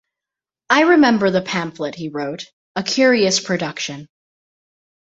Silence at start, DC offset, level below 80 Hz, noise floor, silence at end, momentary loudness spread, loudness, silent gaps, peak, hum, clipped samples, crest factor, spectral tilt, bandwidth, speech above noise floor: 0.7 s; under 0.1%; -62 dBFS; -87 dBFS; 1.1 s; 15 LU; -17 LUFS; 2.53-2.75 s; -2 dBFS; none; under 0.1%; 18 dB; -4 dB/octave; 8 kHz; 70 dB